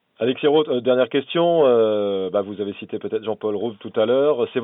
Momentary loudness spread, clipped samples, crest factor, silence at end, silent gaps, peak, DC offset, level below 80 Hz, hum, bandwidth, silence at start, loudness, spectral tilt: 11 LU; under 0.1%; 14 dB; 0 s; none; -6 dBFS; under 0.1%; -76 dBFS; none; 3.9 kHz; 0.2 s; -20 LUFS; -10.5 dB/octave